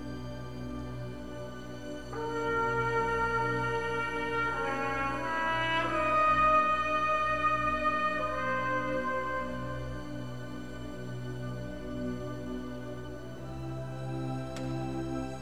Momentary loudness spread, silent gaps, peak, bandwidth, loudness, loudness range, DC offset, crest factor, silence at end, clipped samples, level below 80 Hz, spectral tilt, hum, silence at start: 14 LU; none; -16 dBFS; 14.5 kHz; -32 LUFS; 12 LU; 0.5%; 16 dB; 0 s; under 0.1%; -50 dBFS; -6 dB/octave; none; 0 s